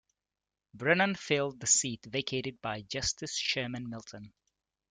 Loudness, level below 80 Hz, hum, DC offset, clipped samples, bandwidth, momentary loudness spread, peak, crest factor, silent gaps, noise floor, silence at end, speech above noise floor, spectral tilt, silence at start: -31 LUFS; -62 dBFS; none; under 0.1%; under 0.1%; 11 kHz; 15 LU; -10 dBFS; 24 dB; none; under -90 dBFS; 0.65 s; over 57 dB; -2.5 dB/octave; 0.75 s